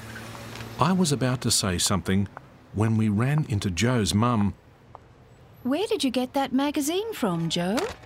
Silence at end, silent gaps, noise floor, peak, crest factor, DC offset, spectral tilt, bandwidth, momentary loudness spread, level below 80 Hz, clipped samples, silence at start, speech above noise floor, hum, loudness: 0 s; none; -51 dBFS; -4 dBFS; 20 dB; under 0.1%; -5 dB/octave; 16 kHz; 12 LU; -50 dBFS; under 0.1%; 0 s; 27 dB; none; -25 LUFS